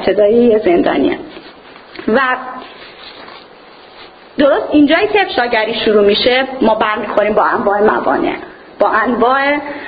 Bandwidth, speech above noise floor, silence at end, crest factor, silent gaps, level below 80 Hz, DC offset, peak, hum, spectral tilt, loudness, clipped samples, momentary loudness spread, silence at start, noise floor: 5 kHz; 26 dB; 0 s; 14 dB; none; -46 dBFS; under 0.1%; 0 dBFS; none; -8 dB/octave; -12 LUFS; under 0.1%; 21 LU; 0 s; -39 dBFS